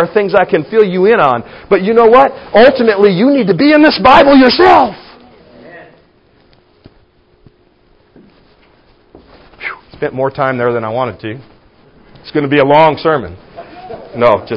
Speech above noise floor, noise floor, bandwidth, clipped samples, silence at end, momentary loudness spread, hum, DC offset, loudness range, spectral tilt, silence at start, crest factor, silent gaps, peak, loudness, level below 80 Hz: 41 dB; -50 dBFS; 8 kHz; 0.4%; 0 s; 18 LU; none; under 0.1%; 12 LU; -7.5 dB/octave; 0 s; 12 dB; none; 0 dBFS; -9 LUFS; -44 dBFS